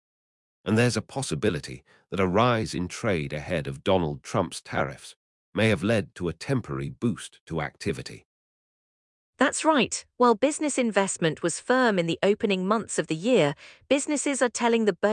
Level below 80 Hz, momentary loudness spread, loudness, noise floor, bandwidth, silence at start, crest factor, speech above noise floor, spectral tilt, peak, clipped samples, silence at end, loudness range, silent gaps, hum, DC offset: -56 dBFS; 10 LU; -26 LUFS; under -90 dBFS; 12 kHz; 0.65 s; 20 dB; over 65 dB; -4.5 dB/octave; -6 dBFS; under 0.1%; 0 s; 5 LU; 5.16-5.53 s, 7.41-7.47 s, 8.25-9.33 s; none; under 0.1%